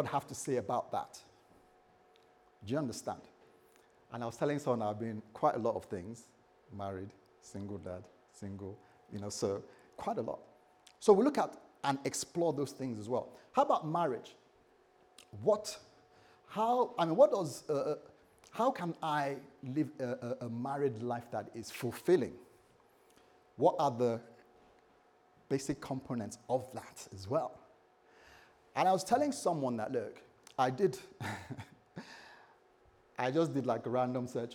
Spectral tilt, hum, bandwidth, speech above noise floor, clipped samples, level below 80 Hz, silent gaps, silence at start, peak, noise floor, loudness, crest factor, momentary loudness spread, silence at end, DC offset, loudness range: -5.5 dB/octave; none; 19 kHz; 32 dB; under 0.1%; -76 dBFS; none; 0 s; -12 dBFS; -67 dBFS; -35 LUFS; 24 dB; 18 LU; 0 s; under 0.1%; 9 LU